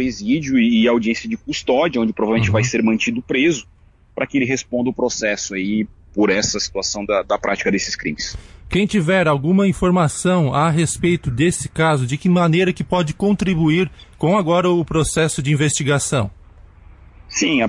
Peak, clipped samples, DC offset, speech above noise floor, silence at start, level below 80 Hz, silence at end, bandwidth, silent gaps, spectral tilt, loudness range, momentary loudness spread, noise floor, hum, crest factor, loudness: -6 dBFS; under 0.1%; under 0.1%; 26 dB; 0 s; -42 dBFS; 0 s; 11.5 kHz; none; -5 dB/octave; 3 LU; 7 LU; -43 dBFS; none; 12 dB; -18 LUFS